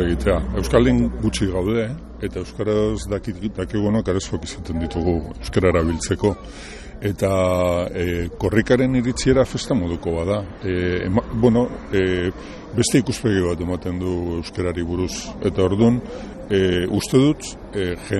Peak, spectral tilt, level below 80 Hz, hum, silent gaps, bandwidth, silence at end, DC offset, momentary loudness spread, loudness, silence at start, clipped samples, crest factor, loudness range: -2 dBFS; -6 dB/octave; -34 dBFS; none; none; 13 kHz; 0 s; under 0.1%; 10 LU; -21 LUFS; 0 s; under 0.1%; 18 dB; 3 LU